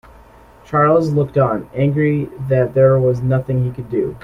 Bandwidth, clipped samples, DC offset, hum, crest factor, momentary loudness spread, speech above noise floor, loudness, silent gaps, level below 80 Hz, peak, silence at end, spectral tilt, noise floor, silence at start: 6.2 kHz; under 0.1%; under 0.1%; none; 14 dB; 8 LU; 28 dB; -16 LUFS; none; -44 dBFS; -2 dBFS; 0.05 s; -10 dB/octave; -44 dBFS; 0.7 s